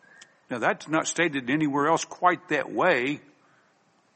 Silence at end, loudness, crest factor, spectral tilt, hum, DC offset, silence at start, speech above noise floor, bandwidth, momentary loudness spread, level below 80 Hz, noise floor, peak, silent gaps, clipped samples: 0.95 s; -25 LUFS; 22 dB; -4 dB/octave; none; under 0.1%; 0.5 s; 39 dB; 8.8 kHz; 5 LU; -72 dBFS; -65 dBFS; -6 dBFS; none; under 0.1%